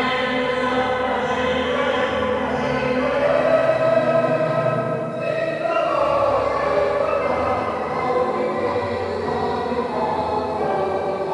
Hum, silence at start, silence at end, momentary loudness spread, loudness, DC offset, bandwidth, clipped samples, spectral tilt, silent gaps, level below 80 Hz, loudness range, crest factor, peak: none; 0 s; 0 s; 5 LU; -21 LUFS; under 0.1%; 11.5 kHz; under 0.1%; -6 dB/octave; none; -46 dBFS; 3 LU; 16 dB; -6 dBFS